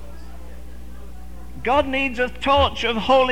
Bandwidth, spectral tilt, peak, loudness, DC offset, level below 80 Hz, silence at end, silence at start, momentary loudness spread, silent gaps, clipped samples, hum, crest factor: 16 kHz; -5 dB/octave; -4 dBFS; -20 LUFS; 2%; -36 dBFS; 0 s; 0 s; 23 LU; none; under 0.1%; 60 Hz at -40 dBFS; 18 dB